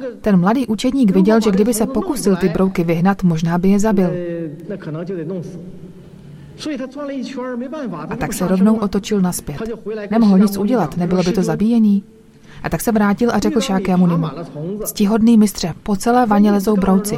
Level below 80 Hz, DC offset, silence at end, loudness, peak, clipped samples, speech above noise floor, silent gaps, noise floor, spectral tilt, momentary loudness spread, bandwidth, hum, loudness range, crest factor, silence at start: -40 dBFS; under 0.1%; 0 s; -17 LUFS; -2 dBFS; under 0.1%; 22 dB; none; -38 dBFS; -6.5 dB/octave; 13 LU; 16 kHz; none; 10 LU; 14 dB; 0 s